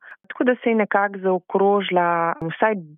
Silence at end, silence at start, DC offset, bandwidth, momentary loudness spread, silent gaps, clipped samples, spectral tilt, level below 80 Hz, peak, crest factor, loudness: 0.05 s; 0.05 s; under 0.1%; 3.8 kHz; 5 LU; none; under 0.1%; -4 dB/octave; -66 dBFS; -6 dBFS; 16 dB; -20 LUFS